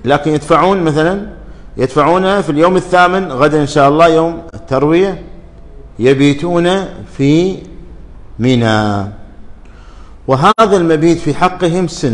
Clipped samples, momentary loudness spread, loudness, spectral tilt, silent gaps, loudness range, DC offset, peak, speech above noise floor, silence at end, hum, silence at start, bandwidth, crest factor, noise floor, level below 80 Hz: under 0.1%; 10 LU; -11 LUFS; -6.5 dB/octave; none; 5 LU; under 0.1%; 0 dBFS; 23 dB; 0 s; none; 0 s; 11 kHz; 12 dB; -33 dBFS; -34 dBFS